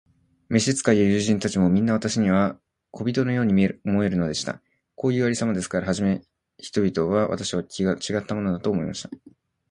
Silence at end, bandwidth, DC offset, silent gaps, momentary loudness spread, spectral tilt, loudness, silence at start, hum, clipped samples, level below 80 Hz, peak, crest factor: 0.55 s; 11.5 kHz; under 0.1%; none; 10 LU; -5.5 dB/octave; -23 LUFS; 0.5 s; none; under 0.1%; -50 dBFS; -4 dBFS; 20 dB